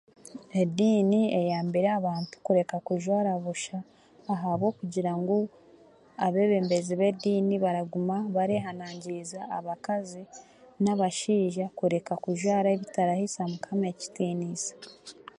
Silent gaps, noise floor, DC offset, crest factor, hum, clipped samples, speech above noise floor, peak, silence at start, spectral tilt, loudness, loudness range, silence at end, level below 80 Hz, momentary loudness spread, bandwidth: none; -56 dBFS; under 0.1%; 16 dB; none; under 0.1%; 29 dB; -12 dBFS; 0.25 s; -6 dB/octave; -28 LUFS; 4 LU; 0.25 s; -74 dBFS; 12 LU; 11.5 kHz